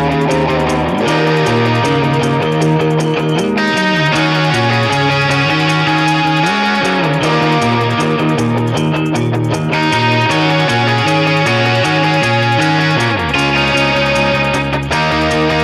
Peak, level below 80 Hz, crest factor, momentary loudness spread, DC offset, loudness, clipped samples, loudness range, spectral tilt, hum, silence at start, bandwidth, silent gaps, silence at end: -2 dBFS; -38 dBFS; 12 dB; 3 LU; under 0.1%; -13 LUFS; under 0.1%; 1 LU; -5.5 dB/octave; none; 0 s; 13.5 kHz; none; 0 s